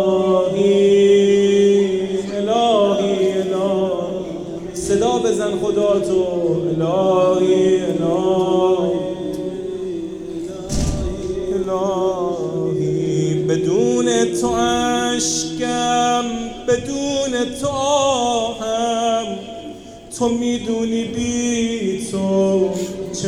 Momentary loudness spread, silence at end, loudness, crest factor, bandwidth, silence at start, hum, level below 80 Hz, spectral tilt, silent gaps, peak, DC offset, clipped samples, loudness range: 11 LU; 0 s; -18 LUFS; 14 dB; 12.5 kHz; 0 s; none; -40 dBFS; -5 dB/octave; none; -4 dBFS; under 0.1%; under 0.1%; 5 LU